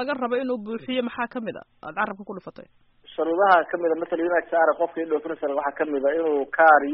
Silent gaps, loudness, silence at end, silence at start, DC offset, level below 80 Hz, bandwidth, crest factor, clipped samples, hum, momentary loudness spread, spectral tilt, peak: none; -23 LUFS; 0 s; 0 s; under 0.1%; -66 dBFS; 5.6 kHz; 20 dB; under 0.1%; none; 17 LU; -2.5 dB/octave; -4 dBFS